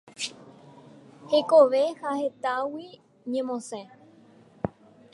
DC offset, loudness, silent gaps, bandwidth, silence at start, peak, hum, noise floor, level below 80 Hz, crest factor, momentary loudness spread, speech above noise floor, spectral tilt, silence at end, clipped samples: under 0.1%; -26 LUFS; none; 11.5 kHz; 0.2 s; -6 dBFS; none; -55 dBFS; -66 dBFS; 22 dB; 21 LU; 30 dB; -4.5 dB/octave; 0.45 s; under 0.1%